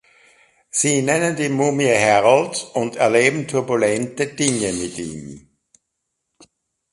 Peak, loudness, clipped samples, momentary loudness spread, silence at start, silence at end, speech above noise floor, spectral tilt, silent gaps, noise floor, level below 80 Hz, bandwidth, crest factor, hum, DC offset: 0 dBFS; -18 LUFS; under 0.1%; 11 LU; 0.75 s; 1.55 s; 58 dB; -4 dB/octave; none; -77 dBFS; -56 dBFS; 11.5 kHz; 20 dB; none; under 0.1%